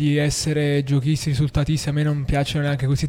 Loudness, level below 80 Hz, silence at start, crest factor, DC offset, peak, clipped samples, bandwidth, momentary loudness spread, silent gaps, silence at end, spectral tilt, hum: -21 LUFS; -36 dBFS; 0 s; 12 dB; under 0.1%; -8 dBFS; under 0.1%; 15.5 kHz; 2 LU; none; 0 s; -6 dB/octave; none